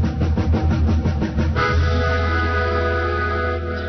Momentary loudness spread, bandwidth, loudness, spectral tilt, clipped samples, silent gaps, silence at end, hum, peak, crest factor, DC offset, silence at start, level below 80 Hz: 3 LU; 6.2 kHz; -20 LUFS; -7.5 dB/octave; under 0.1%; none; 0 s; none; -6 dBFS; 12 dB; under 0.1%; 0 s; -24 dBFS